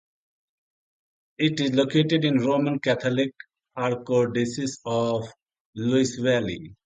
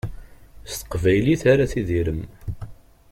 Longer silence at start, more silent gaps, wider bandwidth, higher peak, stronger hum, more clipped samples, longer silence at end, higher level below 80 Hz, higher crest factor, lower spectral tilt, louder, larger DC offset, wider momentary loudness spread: first, 1.4 s vs 0.05 s; first, 5.42-5.46 s, 5.60-5.73 s vs none; second, 9.4 kHz vs 16.5 kHz; second, -8 dBFS vs -4 dBFS; neither; neither; second, 0.1 s vs 0.4 s; second, -62 dBFS vs -38 dBFS; about the same, 18 dB vs 18 dB; about the same, -5.5 dB/octave vs -6.5 dB/octave; second, -24 LUFS vs -21 LUFS; neither; second, 9 LU vs 18 LU